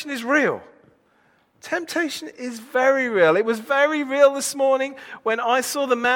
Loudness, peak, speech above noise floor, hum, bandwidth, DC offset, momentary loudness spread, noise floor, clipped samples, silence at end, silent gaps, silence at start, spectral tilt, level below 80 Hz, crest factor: -21 LUFS; -4 dBFS; 40 dB; none; 17.5 kHz; under 0.1%; 12 LU; -61 dBFS; under 0.1%; 0 s; none; 0 s; -3 dB/octave; -72 dBFS; 18 dB